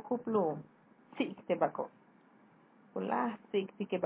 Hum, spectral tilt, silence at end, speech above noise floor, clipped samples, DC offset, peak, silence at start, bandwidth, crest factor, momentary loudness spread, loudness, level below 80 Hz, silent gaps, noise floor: none; -5 dB/octave; 0 s; 29 dB; under 0.1%; under 0.1%; -16 dBFS; 0 s; 4 kHz; 20 dB; 12 LU; -36 LUFS; -86 dBFS; none; -63 dBFS